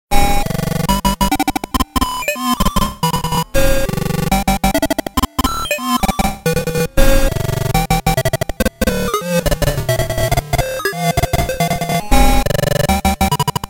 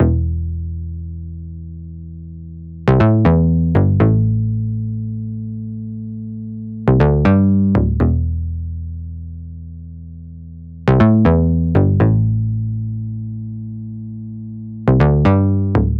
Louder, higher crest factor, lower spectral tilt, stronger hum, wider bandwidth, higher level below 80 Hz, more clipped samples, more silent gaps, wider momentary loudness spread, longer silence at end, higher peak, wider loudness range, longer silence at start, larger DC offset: about the same, -17 LUFS vs -16 LUFS; about the same, 14 dB vs 16 dB; second, -4.5 dB/octave vs -11 dB/octave; neither; first, 17.5 kHz vs 5.2 kHz; first, -20 dBFS vs -28 dBFS; neither; neither; second, 3 LU vs 20 LU; about the same, 0 s vs 0 s; about the same, 0 dBFS vs 0 dBFS; second, 1 LU vs 4 LU; about the same, 0.1 s vs 0 s; neither